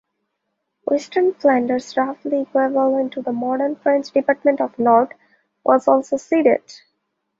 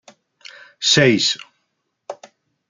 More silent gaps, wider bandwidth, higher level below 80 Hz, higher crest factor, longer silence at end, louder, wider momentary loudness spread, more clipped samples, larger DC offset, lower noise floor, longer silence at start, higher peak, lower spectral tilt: neither; second, 7.8 kHz vs 9.6 kHz; second, -68 dBFS vs -60 dBFS; about the same, 18 dB vs 20 dB; about the same, 0.65 s vs 0.55 s; second, -19 LUFS vs -16 LUFS; second, 7 LU vs 24 LU; neither; neither; about the same, -75 dBFS vs -73 dBFS; about the same, 0.85 s vs 0.8 s; about the same, -2 dBFS vs -2 dBFS; first, -5.5 dB/octave vs -3 dB/octave